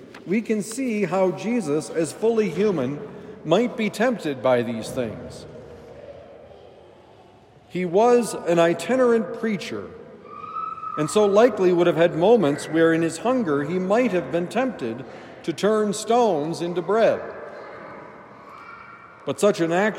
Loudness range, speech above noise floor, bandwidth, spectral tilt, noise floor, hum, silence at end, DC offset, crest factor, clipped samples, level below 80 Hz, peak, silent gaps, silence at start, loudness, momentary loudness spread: 7 LU; 29 dB; 16 kHz; -5.5 dB/octave; -51 dBFS; none; 0 s; under 0.1%; 18 dB; under 0.1%; -64 dBFS; -4 dBFS; none; 0 s; -22 LUFS; 22 LU